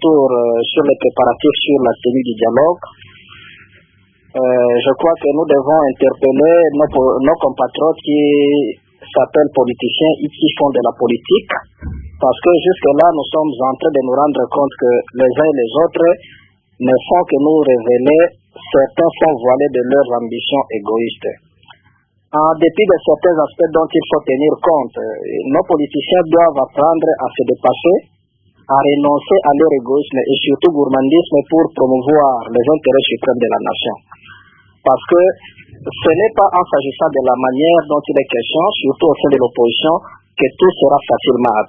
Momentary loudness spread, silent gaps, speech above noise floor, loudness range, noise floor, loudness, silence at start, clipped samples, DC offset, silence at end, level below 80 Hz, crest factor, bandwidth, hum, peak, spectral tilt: 6 LU; none; 43 dB; 3 LU; -55 dBFS; -13 LUFS; 0 s; under 0.1%; under 0.1%; 0.05 s; -46 dBFS; 14 dB; 3.7 kHz; none; 0 dBFS; -9.5 dB/octave